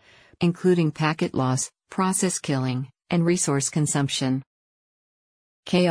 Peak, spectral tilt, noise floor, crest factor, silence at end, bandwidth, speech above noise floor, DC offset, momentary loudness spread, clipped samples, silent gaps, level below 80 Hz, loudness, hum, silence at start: -8 dBFS; -5 dB/octave; under -90 dBFS; 16 dB; 0 s; 10.5 kHz; over 67 dB; under 0.1%; 7 LU; under 0.1%; 4.47-5.63 s; -62 dBFS; -24 LUFS; none; 0.4 s